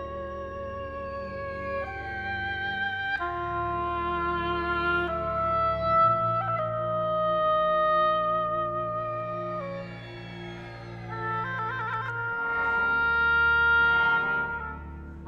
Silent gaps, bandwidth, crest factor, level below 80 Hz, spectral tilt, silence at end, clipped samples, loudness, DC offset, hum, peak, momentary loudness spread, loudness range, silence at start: none; 6.8 kHz; 14 dB; -46 dBFS; -7 dB/octave; 0 s; under 0.1%; -27 LUFS; under 0.1%; none; -14 dBFS; 15 LU; 9 LU; 0 s